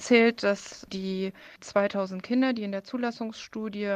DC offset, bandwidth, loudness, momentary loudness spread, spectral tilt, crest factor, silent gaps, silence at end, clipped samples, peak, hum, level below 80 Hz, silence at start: under 0.1%; 9.6 kHz; -28 LUFS; 13 LU; -5 dB/octave; 20 dB; none; 0 s; under 0.1%; -6 dBFS; none; -68 dBFS; 0 s